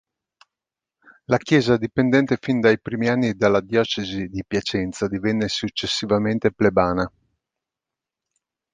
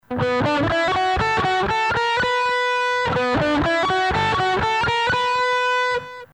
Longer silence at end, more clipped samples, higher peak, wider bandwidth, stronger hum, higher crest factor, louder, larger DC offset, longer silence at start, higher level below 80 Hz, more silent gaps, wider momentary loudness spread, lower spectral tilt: first, 1.65 s vs 0.1 s; neither; first, -2 dBFS vs -10 dBFS; second, 9.6 kHz vs 11.5 kHz; neither; first, 20 dB vs 10 dB; about the same, -21 LUFS vs -19 LUFS; neither; first, 1.3 s vs 0.1 s; second, -50 dBFS vs -42 dBFS; neither; first, 7 LU vs 1 LU; about the same, -5.5 dB/octave vs -4.5 dB/octave